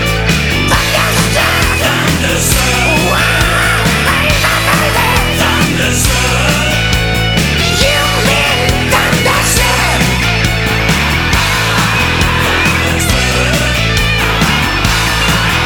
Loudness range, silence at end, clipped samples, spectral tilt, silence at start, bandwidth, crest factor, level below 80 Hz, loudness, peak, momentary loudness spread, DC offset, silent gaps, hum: 1 LU; 0 s; under 0.1%; -3.5 dB/octave; 0 s; over 20 kHz; 10 dB; -20 dBFS; -10 LUFS; 0 dBFS; 2 LU; under 0.1%; none; none